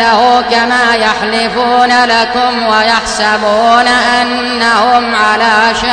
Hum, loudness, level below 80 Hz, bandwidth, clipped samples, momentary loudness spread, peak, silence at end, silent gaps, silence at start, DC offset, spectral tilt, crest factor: none; -9 LUFS; -40 dBFS; 10.5 kHz; under 0.1%; 4 LU; 0 dBFS; 0 s; none; 0 s; under 0.1%; -2.5 dB/octave; 10 dB